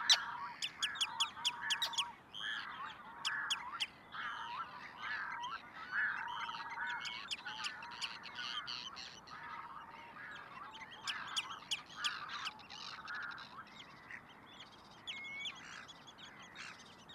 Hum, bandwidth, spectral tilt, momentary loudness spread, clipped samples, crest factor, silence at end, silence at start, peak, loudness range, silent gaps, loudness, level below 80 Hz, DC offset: none; 16 kHz; 0.5 dB/octave; 16 LU; under 0.1%; 28 dB; 0 s; 0 s; -14 dBFS; 9 LU; none; -41 LUFS; -78 dBFS; under 0.1%